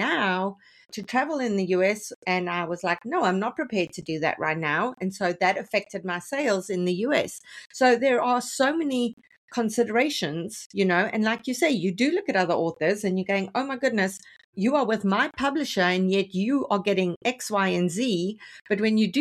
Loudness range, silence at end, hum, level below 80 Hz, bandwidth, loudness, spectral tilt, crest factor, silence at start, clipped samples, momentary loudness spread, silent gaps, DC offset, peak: 2 LU; 0 s; none; -68 dBFS; 14 kHz; -25 LUFS; -5 dB/octave; 18 dB; 0 s; under 0.1%; 7 LU; 2.16-2.22 s, 9.13-9.17 s, 9.37-9.48 s, 10.66-10.70 s, 14.44-14.53 s, 17.16-17.21 s; under 0.1%; -8 dBFS